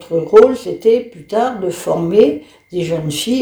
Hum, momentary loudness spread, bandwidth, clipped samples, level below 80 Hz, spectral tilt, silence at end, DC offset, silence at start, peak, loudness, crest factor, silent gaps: none; 12 LU; over 20 kHz; 0.6%; -50 dBFS; -5.5 dB/octave; 0 s; under 0.1%; 0 s; 0 dBFS; -14 LUFS; 14 dB; none